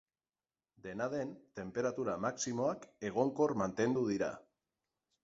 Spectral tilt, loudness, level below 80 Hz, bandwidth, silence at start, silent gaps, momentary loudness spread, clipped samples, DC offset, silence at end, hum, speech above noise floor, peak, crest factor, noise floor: -5.5 dB/octave; -36 LUFS; -72 dBFS; 7.6 kHz; 0.85 s; none; 12 LU; under 0.1%; under 0.1%; 0.8 s; none; over 54 dB; -18 dBFS; 20 dB; under -90 dBFS